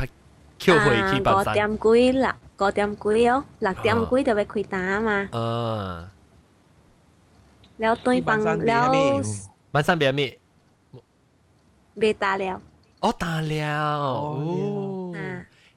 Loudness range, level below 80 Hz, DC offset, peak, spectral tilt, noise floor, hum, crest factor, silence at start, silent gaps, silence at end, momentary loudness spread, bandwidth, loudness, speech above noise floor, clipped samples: 7 LU; -50 dBFS; under 0.1%; -6 dBFS; -5.5 dB/octave; -61 dBFS; none; 18 dB; 0 s; none; 0.3 s; 12 LU; 14.5 kHz; -23 LUFS; 39 dB; under 0.1%